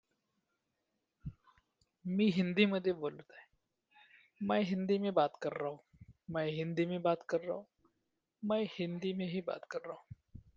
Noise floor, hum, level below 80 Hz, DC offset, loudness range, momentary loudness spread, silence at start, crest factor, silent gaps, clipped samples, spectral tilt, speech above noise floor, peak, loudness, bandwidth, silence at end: -85 dBFS; none; -70 dBFS; under 0.1%; 4 LU; 20 LU; 1.25 s; 24 dB; none; under 0.1%; -7.5 dB/octave; 50 dB; -14 dBFS; -36 LUFS; 7.4 kHz; 0.15 s